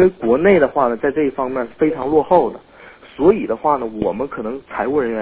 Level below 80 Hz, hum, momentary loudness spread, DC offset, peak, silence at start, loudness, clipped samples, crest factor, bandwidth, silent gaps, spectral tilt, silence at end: -46 dBFS; none; 11 LU; under 0.1%; 0 dBFS; 0 s; -17 LUFS; under 0.1%; 16 dB; 4 kHz; none; -11 dB/octave; 0 s